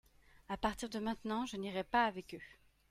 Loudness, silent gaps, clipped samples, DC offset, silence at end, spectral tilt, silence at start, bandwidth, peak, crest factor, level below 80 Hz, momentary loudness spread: -38 LUFS; none; under 0.1%; under 0.1%; 0.4 s; -4.5 dB/octave; 0.35 s; 16 kHz; -20 dBFS; 20 dB; -60 dBFS; 17 LU